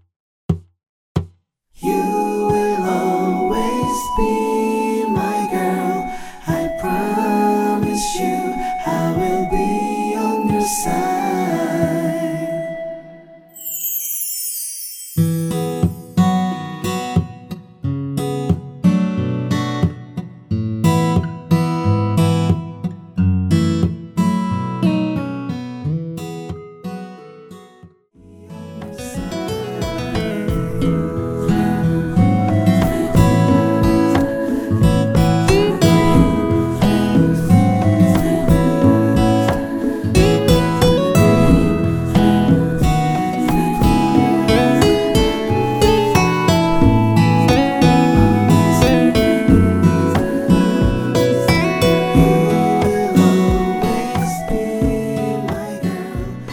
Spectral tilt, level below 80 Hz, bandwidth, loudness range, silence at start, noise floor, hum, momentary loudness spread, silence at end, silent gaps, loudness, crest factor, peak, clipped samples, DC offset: -6.5 dB/octave; -30 dBFS; over 20 kHz; 8 LU; 0.5 s; -53 dBFS; none; 11 LU; 0 s; 0.89-1.15 s; -17 LUFS; 16 dB; 0 dBFS; under 0.1%; under 0.1%